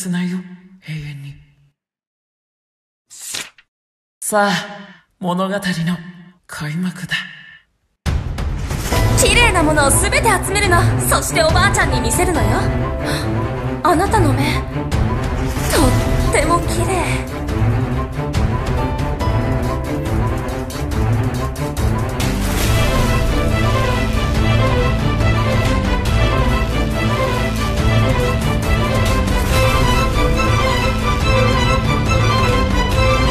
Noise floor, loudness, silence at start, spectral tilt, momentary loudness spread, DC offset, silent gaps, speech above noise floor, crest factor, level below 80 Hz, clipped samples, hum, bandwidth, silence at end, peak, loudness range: -59 dBFS; -17 LUFS; 0 s; -5 dB/octave; 9 LU; 0.4%; 2.07-3.05 s, 3.68-4.21 s; 43 dB; 16 dB; -22 dBFS; under 0.1%; none; 14 kHz; 0 s; 0 dBFS; 9 LU